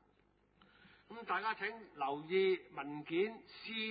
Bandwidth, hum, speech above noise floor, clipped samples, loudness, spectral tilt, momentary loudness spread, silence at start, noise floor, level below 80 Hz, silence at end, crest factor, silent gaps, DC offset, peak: 4.9 kHz; 50 Hz at -75 dBFS; 34 dB; under 0.1%; -39 LUFS; -2.5 dB/octave; 13 LU; 1.1 s; -73 dBFS; -80 dBFS; 0 s; 16 dB; none; under 0.1%; -24 dBFS